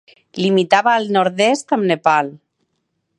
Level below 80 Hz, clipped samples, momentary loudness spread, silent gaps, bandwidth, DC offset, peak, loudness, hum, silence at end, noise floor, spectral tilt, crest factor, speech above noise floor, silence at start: -68 dBFS; under 0.1%; 7 LU; none; 11.5 kHz; under 0.1%; 0 dBFS; -16 LUFS; none; 0.85 s; -71 dBFS; -5 dB/octave; 18 dB; 55 dB; 0.35 s